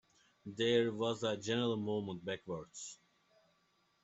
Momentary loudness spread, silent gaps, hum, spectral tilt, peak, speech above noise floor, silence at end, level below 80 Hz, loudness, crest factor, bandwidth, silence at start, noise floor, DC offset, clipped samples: 16 LU; none; none; -5 dB/octave; -20 dBFS; 39 dB; 1.1 s; -76 dBFS; -37 LUFS; 20 dB; 8.2 kHz; 0.45 s; -76 dBFS; under 0.1%; under 0.1%